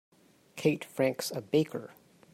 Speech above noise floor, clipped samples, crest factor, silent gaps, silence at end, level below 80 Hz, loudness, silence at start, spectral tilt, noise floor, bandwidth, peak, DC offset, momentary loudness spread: 21 dB; under 0.1%; 20 dB; none; 0.45 s; -74 dBFS; -31 LUFS; 0.55 s; -5.5 dB/octave; -51 dBFS; 16 kHz; -14 dBFS; under 0.1%; 15 LU